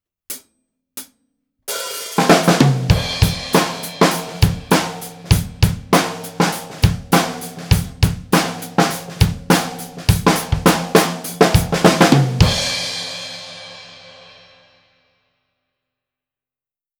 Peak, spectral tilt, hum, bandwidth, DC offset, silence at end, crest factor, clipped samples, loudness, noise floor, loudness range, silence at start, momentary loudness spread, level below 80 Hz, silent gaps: 0 dBFS; -5 dB/octave; none; over 20 kHz; under 0.1%; 2.9 s; 18 dB; under 0.1%; -17 LUFS; under -90 dBFS; 4 LU; 0.3 s; 18 LU; -30 dBFS; none